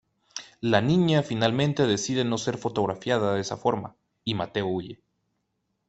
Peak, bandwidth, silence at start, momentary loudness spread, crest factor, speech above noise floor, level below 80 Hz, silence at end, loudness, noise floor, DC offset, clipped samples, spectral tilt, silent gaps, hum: -4 dBFS; 8.4 kHz; 0.35 s; 14 LU; 22 dB; 52 dB; -60 dBFS; 0.95 s; -26 LUFS; -77 dBFS; under 0.1%; under 0.1%; -5.5 dB/octave; none; none